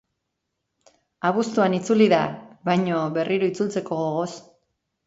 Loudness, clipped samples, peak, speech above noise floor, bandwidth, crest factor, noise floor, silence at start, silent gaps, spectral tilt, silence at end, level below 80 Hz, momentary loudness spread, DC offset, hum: -23 LUFS; under 0.1%; -4 dBFS; 57 dB; 8 kHz; 20 dB; -79 dBFS; 1.25 s; none; -6 dB/octave; 0.65 s; -68 dBFS; 11 LU; under 0.1%; none